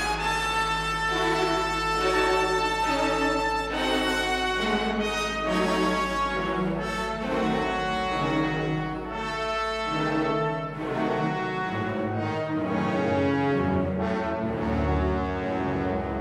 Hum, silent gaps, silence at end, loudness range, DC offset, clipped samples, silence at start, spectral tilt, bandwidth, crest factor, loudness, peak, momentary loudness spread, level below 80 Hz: none; none; 0 s; 3 LU; under 0.1%; under 0.1%; 0 s; -5 dB/octave; 15.5 kHz; 14 dB; -26 LUFS; -12 dBFS; 5 LU; -40 dBFS